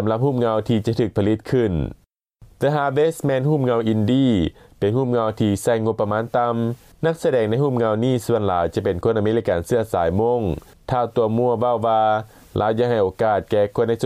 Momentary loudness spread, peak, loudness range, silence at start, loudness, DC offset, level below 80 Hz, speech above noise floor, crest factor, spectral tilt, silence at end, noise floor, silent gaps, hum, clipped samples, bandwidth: 5 LU; -8 dBFS; 1 LU; 0 s; -20 LUFS; under 0.1%; -44 dBFS; 31 dB; 10 dB; -7.5 dB/octave; 0 s; -51 dBFS; none; none; under 0.1%; 15 kHz